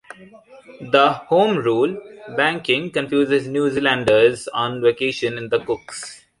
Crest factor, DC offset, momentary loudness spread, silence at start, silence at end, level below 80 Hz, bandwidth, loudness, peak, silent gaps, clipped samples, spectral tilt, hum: 18 dB; under 0.1%; 12 LU; 0.2 s; 0.25 s; -58 dBFS; 11.5 kHz; -19 LUFS; -2 dBFS; none; under 0.1%; -5 dB/octave; none